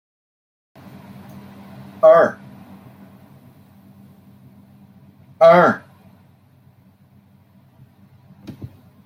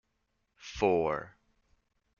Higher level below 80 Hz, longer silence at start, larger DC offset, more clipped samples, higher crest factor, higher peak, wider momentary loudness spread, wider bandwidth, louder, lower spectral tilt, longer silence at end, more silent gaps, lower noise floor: second, -68 dBFS vs -58 dBFS; first, 2.05 s vs 0.6 s; neither; neither; about the same, 20 dB vs 22 dB; first, -2 dBFS vs -12 dBFS; first, 29 LU vs 22 LU; about the same, 6.6 kHz vs 7.2 kHz; first, -14 LUFS vs -31 LUFS; first, -7 dB/octave vs -4.5 dB/octave; second, 0.4 s vs 0.9 s; neither; second, -52 dBFS vs -79 dBFS